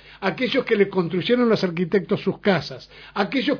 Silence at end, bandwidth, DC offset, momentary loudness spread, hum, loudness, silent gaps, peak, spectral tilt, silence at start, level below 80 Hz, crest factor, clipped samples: 0 s; 5.4 kHz; under 0.1%; 8 LU; none; -22 LUFS; none; -4 dBFS; -7 dB/octave; 0.05 s; -58 dBFS; 18 dB; under 0.1%